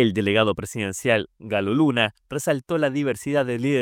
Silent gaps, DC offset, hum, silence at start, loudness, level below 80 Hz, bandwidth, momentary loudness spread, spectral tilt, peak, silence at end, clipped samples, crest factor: none; under 0.1%; none; 0 s; -23 LUFS; -58 dBFS; 17 kHz; 7 LU; -5 dB/octave; -4 dBFS; 0 s; under 0.1%; 18 dB